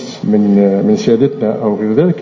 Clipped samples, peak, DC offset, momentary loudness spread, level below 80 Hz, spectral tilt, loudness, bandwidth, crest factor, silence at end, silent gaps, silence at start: under 0.1%; 0 dBFS; under 0.1%; 5 LU; -54 dBFS; -8 dB/octave; -12 LUFS; 7.4 kHz; 12 dB; 0 s; none; 0 s